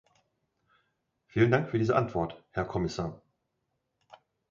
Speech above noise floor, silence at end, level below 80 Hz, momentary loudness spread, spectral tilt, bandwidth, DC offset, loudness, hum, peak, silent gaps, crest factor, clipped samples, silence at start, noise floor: 52 dB; 1.35 s; -56 dBFS; 11 LU; -7.5 dB/octave; 7.4 kHz; under 0.1%; -30 LUFS; none; -10 dBFS; none; 22 dB; under 0.1%; 1.35 s; -81 dBFS